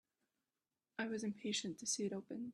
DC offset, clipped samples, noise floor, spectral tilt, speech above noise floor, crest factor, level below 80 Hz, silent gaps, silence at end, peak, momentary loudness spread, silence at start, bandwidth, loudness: under 0.1%; under 0.1%; under -90 dBFS; -3 dB/octave; over 47 dB; 18 dB; -86 dBFS; none; 0 s; -26 dBFS; 6 LU; 1 s; 12.5 kHz; -42 LUFS